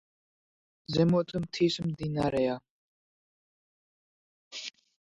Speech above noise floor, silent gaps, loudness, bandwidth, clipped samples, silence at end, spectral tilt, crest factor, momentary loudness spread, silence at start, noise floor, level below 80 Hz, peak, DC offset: over 62 dB; 2.70-4.51 s; -29 LUFS; 10.5 kHz; under 0.1%; 0.45 s; -6.5 dB/octave; 20 dB; 16 LU; 0.9 s; under -90 dBFS; -60 dBFS; -12 dBFS; under 0.1%